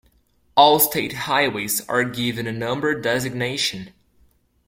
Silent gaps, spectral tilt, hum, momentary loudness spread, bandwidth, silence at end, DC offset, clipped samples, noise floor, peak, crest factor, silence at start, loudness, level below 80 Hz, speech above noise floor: none; -3 dB/octave; none; 10 LU; 16.5 kHz; 0.8 s; under 0.1%; under 0.1%; -61 dBFS; -2 dBFS; 20 dB; 0.55 s; -20 LUFS; -58 dBFS; 40 dB